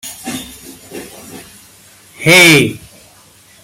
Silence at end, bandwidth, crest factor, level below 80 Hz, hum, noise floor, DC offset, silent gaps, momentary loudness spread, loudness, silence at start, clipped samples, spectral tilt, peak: 0.85 s; 17.5 kHz; 16 dB; -50 dBFS; none; -44 dBFS; under 0.1%; none; 28 LU; -7 LUFS; 0.05 s; under 0.1%; -3 dB/octave; 0 dBFS